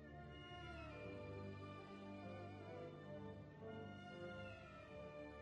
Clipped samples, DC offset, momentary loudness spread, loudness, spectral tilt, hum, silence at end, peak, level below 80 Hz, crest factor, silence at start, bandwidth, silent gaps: under 0.1%; under 0.1%; 3 LU; -55 LUFS; -7 dB/octave; none; 0 s; -42 dBFS; -68 dBFS; 12 dB; 0 s; 9.8 kHz; none